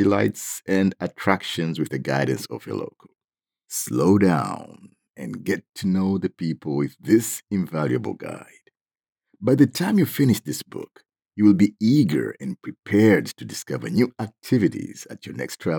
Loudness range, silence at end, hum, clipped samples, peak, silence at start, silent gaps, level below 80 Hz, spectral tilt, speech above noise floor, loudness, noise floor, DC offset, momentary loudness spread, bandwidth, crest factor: 5 LU; 0 s; none; under 0.1%; -2 dBFS; 0 s; 5.10-5.14 s, 5.69-5.73 s, 8.81-8.85 s; -70 dBFS; -6 dB/octave; 65 dB; -22 LUFS; -87 dBFS; under 0.1%; 16 LU; over 20 kHz; 22 dB